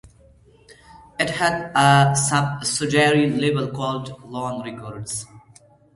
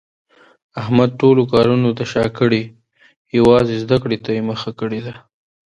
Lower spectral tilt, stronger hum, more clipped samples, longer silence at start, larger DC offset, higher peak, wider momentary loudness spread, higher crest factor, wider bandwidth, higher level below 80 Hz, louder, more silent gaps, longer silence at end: second, -4.5 dB/octave vs -7.5 dB/octave; neither; neither; about the same, 0.7 s vs 0.75 s; neither; about the same, 0 dBFS vs 0 dBFS; about the same, 16 LU vs 14 LU; first, 22 dB vs 16 dB; about the same, 11.5 kHz vs 10.5 kHz; second, -54 dBFS vs -46 dBFS; second, -20 LUFS vs -16 LUFS; second, none vs 3.16-3.25 s; about the same, 0.55 s vs 0.55 s